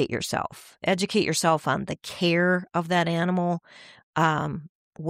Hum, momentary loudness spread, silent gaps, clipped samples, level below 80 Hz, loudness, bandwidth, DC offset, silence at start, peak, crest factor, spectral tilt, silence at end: none; 10 LU; 4.03-4.13 s, 4.69-4.93 s; under 0.1%; -60 dBFS; -25 LUFS; 16 kHz; under 0.1%; 0 s; -8 dBFS; 16 dB; -5 dB/octave; 0 s